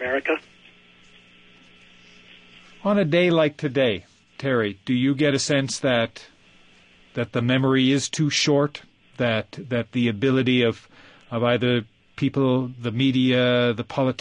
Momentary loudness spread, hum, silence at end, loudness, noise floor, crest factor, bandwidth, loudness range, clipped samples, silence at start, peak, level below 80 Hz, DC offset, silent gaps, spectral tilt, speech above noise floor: 9 LU; none; 0.05 s; -22 LUFS; -54 dBFS; 18 dB; 10.5 kHz; 2 LU; under 0.1%; 0 s; -6 dBFS; -60 dBFS; under 0.1%; none; -5 dB/octave; 32 dB